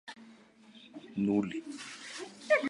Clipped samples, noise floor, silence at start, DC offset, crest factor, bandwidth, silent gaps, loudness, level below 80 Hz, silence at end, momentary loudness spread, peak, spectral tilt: under 0.1%; -57 dBFS; 0.05 s; under 0.1%; 20 dB; 11.5 kHz; none; -35 LUFS; -74 dBFS; 0 s; 22 LU; -14 dBFS; -5.5 dB/octave